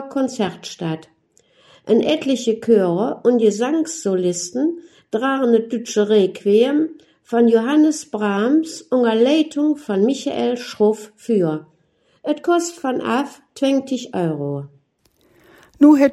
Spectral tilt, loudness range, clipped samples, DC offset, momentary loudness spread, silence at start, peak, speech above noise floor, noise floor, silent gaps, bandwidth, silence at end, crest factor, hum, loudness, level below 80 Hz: -5.5 dB/octave; 5 LU; under 0.1%; under 0.1%; 11 LU; 0 s; 0 dBFS; 43 dB; -61 dBFS; none; 12.5 kHz; 0 s; 18 dB; none; -18 LUFS; -66 dBFS